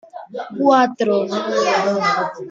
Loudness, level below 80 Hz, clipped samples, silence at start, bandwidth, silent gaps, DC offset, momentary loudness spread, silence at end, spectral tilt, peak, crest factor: -17 LUFS; -68 dBFS; under 0.1%; 0.15 s; 7.6 kHz; none; under 0.1%; 15 LU; 0 s; -4.5 dB/octave; -2 dBFS; 16 dB